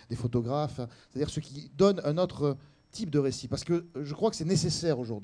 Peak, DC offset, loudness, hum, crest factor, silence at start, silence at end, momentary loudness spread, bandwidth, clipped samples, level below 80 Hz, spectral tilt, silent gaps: -12 dBFS; under 0.1%; -30 LUFS; none; 18 dB; 0.1 s; 0 s; 13 LU; 10.5 kHz; under 0.1%; -56 dBFS; -6 dB/octave; none